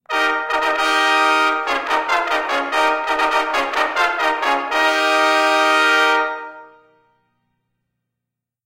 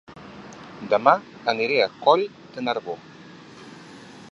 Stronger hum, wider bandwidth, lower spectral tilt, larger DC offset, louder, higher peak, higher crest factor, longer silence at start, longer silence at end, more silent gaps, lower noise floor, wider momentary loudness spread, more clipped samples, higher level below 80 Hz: neither; first, 16.5 kHz vs 8 kHz; second, 0 dB/octave vs -5 dB/octave; neither; first, -16 LUFS vs -22 LUFS; second, -4 dBFS vs 0 dBFS; second, 16 dB vs 24 dB; about the same, 0.1 s vs 0.1 s; first, 2 s vs 0 s; neither; first, -83 dBFS vs -44 dBFS; second, 5 LU vs 24 LU; neither; first, -56 dBFS vs -68 dBFS